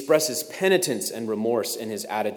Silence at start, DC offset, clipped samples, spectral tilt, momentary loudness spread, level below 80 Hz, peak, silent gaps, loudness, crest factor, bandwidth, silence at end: 0 s; under 0.1%; under 0.1%; -3 dB/octave; 8 LU; -78 dBFS; -6 dBFS; none; -24 LUFS; 18 dB; over 20 kHz; 0 s